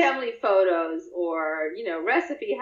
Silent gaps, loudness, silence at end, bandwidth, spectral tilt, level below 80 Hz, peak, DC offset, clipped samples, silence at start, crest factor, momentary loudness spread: none; -25 LUFS; 0 s; 7.6 kHz; -3.5 dB/octave; -74 dBFS; -8 dBFS; under 0.1%; under 0.1%; 0 s; 16 dB; 8 LU